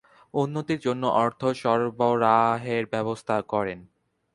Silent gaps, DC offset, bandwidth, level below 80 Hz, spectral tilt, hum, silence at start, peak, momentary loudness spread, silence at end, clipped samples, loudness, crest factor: none; under 0.1%; 11.5 kHz; -64 dBFS; -6.5 dB/octave; none; 0.35 s; -6 dBFS; 8 LU; 0.5 s; under 0.1%; -25 LUFS; 20 dB